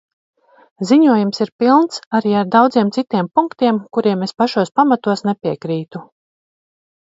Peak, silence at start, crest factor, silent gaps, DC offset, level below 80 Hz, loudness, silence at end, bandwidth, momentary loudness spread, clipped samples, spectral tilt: 0 dBFS; 0.8 s; 16 dB; 1.52-1.59 s, 2.06-2.11 s; under 0.1%; -64 dBFS; -16 LUFS; 0.95 s; 7.8 kHz; 10 LU; under 0.1%; -6.5 dB/octave